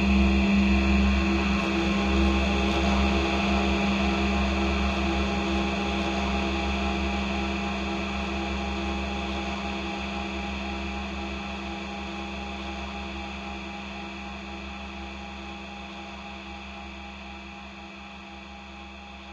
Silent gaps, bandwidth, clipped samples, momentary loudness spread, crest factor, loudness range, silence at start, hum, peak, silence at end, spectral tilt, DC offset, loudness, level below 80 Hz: none; 8.4 kHz; under 0.1%; 16 LU; 16 dB; 14 LU; 0 s; none; -12 dBFS; 0 s; -5.5 dB/octave; under 0.1%; -27 LUFS; -34 dBFS